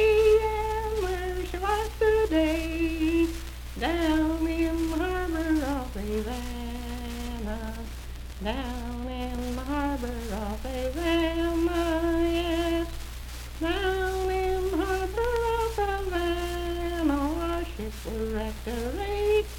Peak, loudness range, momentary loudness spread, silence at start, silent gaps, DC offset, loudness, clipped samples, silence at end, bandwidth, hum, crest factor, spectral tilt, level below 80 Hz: -12 dBFS; 7 LU; 10 LU; 0 s; none; under 0.1%; -28 LUFS; under 0.1%; 0 s; 17.5 kHz; 60 Hz at -35 dBFS; 16 dB; -5.5 dB/octave; -36 dBFS